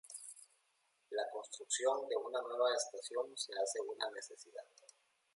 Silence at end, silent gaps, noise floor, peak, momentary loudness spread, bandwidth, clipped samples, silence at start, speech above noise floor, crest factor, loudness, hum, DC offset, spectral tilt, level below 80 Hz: 0.7 s; none; -79 dBFS; -22 dBFS; 17 LU; 11.5 kHz; under 0.1%; 0.05 s; 39 dB; 20 dB; -40 LUFS; none; under 0.1%; 1 dB/octave; under -90 dBFS